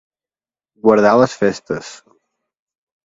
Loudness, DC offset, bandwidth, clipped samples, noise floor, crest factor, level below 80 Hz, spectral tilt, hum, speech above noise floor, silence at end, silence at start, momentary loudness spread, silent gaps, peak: -15 LUFS; under 0.1%; 7.8 kHz; under 0.1%; under -90 dBFS; 18 dB; -56 dBFS; -6 dB/octave; none; over 75 dB; 1.1 s; 0.85 s; 15 LU; none; 0 dBFS